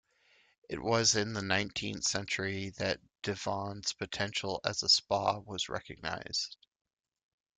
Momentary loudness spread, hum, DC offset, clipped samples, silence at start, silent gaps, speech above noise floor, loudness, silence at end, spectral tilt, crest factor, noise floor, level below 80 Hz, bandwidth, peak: 12 LU; none; under 0.1%; under 0.1%; 0.7 s; none; 34 dB; -32 LUFS; 1.05 s; -2.5 dB/octave; 22 dB; -68 dBFS; -64 dBFS; 11 kHz; -12 dBFS